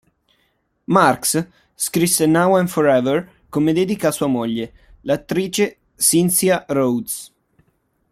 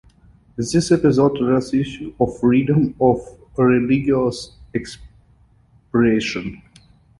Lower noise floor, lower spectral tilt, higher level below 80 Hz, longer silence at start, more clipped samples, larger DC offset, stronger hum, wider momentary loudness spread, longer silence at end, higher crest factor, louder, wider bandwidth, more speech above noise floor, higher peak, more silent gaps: first, -66 dBFS vs -54 dBFS; second, -4.5 dB/octave vs -6.5 dB/octave; second, -56 dBFS vs -46 dBFS; first, 0.9 s vs 0.6 s; neither; neither; neither; about the same, 11 LU vs 13 LU; first, 0.85 s vs 0.6 s; about the same, 18 dB vs 18 dB; about the same, -18 LUFS vs -19 LUFS; first, 16 kHz vs 11.5 kHz; first, 48 dB vs 36 dB; about the same, -2 dBFS vs -2 dBFS; neither